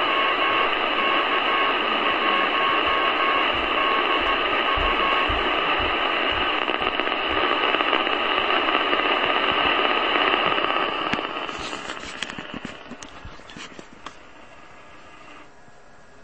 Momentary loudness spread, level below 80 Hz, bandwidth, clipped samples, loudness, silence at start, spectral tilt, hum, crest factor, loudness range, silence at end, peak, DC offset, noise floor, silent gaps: 17 LU; -46 dBFS; 8.8 kHz; under 0.1%; -21 LUFS; 0 s; -3.5 dB/octave; none; 22 dB; 15 LU; 0.8 s; -2 dBFS; 0.5%; -50 dBFS; none